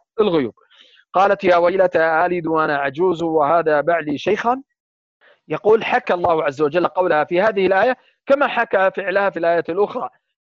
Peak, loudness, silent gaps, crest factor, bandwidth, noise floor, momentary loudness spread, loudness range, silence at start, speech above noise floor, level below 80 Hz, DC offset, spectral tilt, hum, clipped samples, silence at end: -4 dBFS; -18 LUFS; 4.80-5.20 s; 14 dB; 7.4 kHz; -51 dBFS; 6 LU; 3 LU; 0.15 s; 34 dB; -60 dBFS; under 0.1%; -6.5 dB/octave; none; under 0.1%; 0.35 s